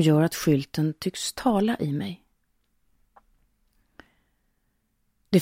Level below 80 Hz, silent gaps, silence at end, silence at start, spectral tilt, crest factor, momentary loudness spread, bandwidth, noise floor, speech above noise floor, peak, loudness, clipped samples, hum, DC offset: -60 dBFS; none; 0 s; 0 s; -6 dB/octave; 20 dB; 9 LU; 16.5 kHz; -72 dBFS; 48 dB; -8 dBFS; -25 LUFS; under 0.1%; none; under 0.1%